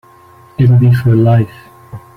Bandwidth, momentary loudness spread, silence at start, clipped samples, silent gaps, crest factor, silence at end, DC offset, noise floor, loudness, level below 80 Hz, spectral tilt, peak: 4.6 kHz; 12 LU; 0.6 s; under 0.1%; none; 10 dB; 0.2 s; under 0.1%; -41 dBFS; -10 LUFS; -42 dBFS; -10 dB/octave; -2 dBFS